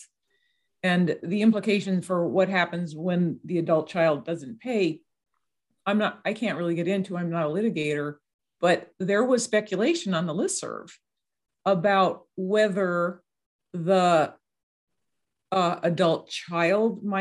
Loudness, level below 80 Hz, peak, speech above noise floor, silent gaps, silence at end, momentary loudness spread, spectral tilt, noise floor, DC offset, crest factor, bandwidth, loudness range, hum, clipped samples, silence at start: -25 LUFS; -74 dBFS; -8 dBFS; 59 dB; 8.34-8.39 s, 13.46-13.59 s, 14.63-14.87 s; 0 s; 9 LU; -5.5 dB/octave; -83 dBFS; under 0.1%; 18 dB; 12 kHz; 3 LU; none; under 0.1%; 0 s